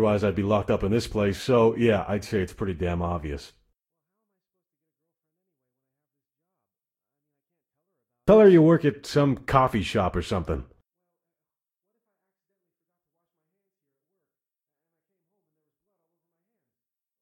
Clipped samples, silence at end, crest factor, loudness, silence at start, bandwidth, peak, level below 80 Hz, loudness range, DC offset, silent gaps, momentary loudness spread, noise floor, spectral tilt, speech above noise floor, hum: under 0.1%; 6.6 s; 22 dB; -23 LUFS; 0 s; 14.5 kHz; -4 dBFS; -46 dBFS; 16 LU; under 0.1%; none; 14 LU; under -90 dBFS; -7 dB/octave; over 68 dB; none